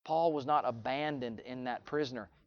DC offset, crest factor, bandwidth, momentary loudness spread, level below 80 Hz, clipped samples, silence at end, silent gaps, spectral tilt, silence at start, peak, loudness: under 0.1%; 18 dB; 7 kHz; 9 LU; -70 dBFS; under 0.1%; 0.2 s; none; -6.5 dB/octave; 0.05 s; -18 dBFS; -35 LUFS